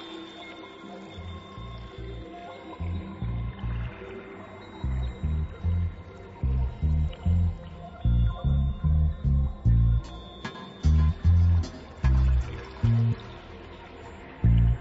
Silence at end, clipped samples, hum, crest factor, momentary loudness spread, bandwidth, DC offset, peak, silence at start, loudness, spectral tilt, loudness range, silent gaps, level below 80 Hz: 0 s; under 0.1%; none; 14 dB; 19 LU; 7.4 kHz; under 0.1%; -12 dBFS; 0 s; -27 LUFS; -8.5 dB/octave; 11 LU; none; -30 dBFS